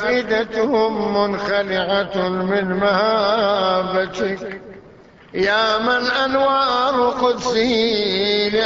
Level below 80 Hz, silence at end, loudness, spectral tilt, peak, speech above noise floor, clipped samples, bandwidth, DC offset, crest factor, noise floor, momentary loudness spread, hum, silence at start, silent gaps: -50 dBFS; 0 s; -18 LUFS; -4.5 dB/octave; -4 dBFS; 27 dB; under 0.1%; 7.8 kHz; under 0.1%; 14 dB; -45 dBFS; 5 LU; none; 0 s; none